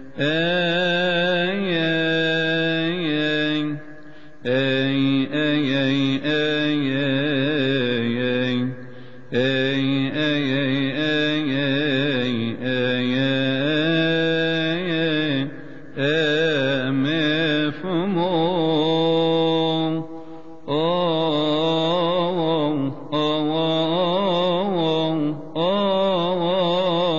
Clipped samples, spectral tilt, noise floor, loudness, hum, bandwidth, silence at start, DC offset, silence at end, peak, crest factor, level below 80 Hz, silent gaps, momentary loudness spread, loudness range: under 0.1%; -7 dB/octave; -44 dBFS; -21 LUFS; none; 7.4 kHz; 0 s; 1%; 0 s; -8 dBFS; 12 dB; -66 dBFS; none; 5 LU; 2 LU